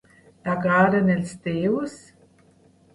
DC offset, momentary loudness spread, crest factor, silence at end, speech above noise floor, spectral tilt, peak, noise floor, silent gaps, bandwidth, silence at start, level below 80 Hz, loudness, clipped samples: under 0.1%; 12 LU; 18 dB; 1 s; 35 dB; -7.5 dB/octave; -6 dBFS; -57 dBFS; none; 11.5 kHz; 0.45 s; -58 dBFS; -22 LUFS; under 0.1%